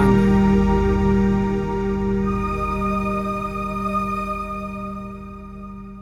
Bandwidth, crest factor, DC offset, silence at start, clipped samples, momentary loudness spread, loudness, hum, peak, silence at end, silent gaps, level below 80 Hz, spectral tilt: 10.5 kHz; 16 dB; under 0.1%; 0 s; under 0.1%; 18 LU; -21 LUFS; 50 Hz at -45 dBFS; -4 dBFS; 0 s; none; -30 dBFS; -8.5 dB/octave